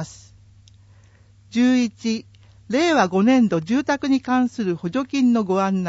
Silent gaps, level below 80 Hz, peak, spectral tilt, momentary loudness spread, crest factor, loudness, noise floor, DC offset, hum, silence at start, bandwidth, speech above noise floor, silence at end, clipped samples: none; -58 dBFS; -4 dBFS; -5.5 dB/octave; 9 LU; 16 dB; -20 LUFS; -51 dBFS; under 0.1%; none; 0 s; 8 kHz; 32 dB; 0 s; under 0.1%